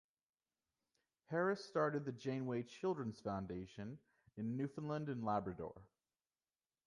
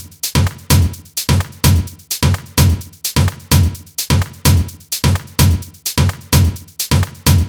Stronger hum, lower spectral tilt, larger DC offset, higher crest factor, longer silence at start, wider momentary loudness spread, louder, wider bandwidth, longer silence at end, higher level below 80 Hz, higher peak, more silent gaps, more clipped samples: neither; first, -7.5 dB/octave vs -4.5 dB/octave; neither; first, 20 dB vs 14 dB; first, 1.3 s vs 0 s; first, 12 LU vs 6 LU; second, -43 LUFS vs -16 LUFS; second, 11 kHz vs over 20 kHz; first, 1 s vs 0 s; second, -72 dBFS vs -24 dBFS; second, -24 dBFS vs 0 dBFS; neither; neither